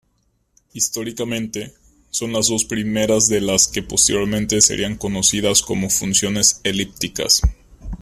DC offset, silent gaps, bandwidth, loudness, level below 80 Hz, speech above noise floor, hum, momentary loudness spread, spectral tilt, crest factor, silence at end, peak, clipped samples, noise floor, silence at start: under 0.1%; none; 16 kHz; -17 LUFS; -34 dBFS; 46 dB; none; 11 LU; -2.5 dB/octave; 20 dB; 0.05 s; 0 dBFS; under 0.1%; -65 dBFS; 0.75 s